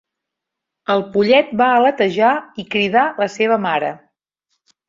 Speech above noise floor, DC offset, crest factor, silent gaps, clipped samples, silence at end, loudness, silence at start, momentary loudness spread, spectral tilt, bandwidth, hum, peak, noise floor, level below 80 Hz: 66 dB; under 0.1%; 16 dB; none; under 0.1%; 0.9 s; -16 LUFS; 0.9 s; 9 LU; -5.5 dB/octave; 7.6 kHz; none; -2 dBFS; -82 dBFS; -62 dBFS